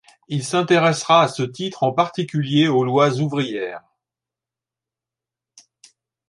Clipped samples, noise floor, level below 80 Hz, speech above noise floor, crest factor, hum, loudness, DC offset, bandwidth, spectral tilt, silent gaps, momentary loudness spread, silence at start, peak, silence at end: under 0.1%; -88 dBFS; -66 dBFS; 70 dB; 20 dB; none; -19 LUFS; under 0.1%; 11.5 kHz; -5.5 dB/octave; none; 11 LU; 0.3 s; -2 dBFS; 2.5 s